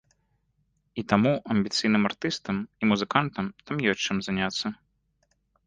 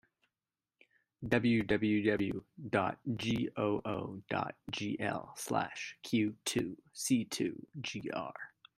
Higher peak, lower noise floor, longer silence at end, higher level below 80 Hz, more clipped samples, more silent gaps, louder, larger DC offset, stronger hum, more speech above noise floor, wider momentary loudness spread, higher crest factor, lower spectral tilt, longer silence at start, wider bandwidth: first, -4 dBFS vs -14 dBFS; second, -72 dBFS vs under -90 dBFS; first, 0.9 s vs 0.3 s; first, -58 dBFS vs -66 dBFS; neither; neither; first, -26 LUFS vs -35 LUFS; neither; neither; second, 46 dB vs over 55 dB; about the same, 9 LU vs 11 LU; about the same, 22 dB vs 22 dB; about the same, -5 dB/octave vs -5 dB/octave; second, 0.95 s vs 1.2 s; second, 9.4 kHz vs 15.5 kHz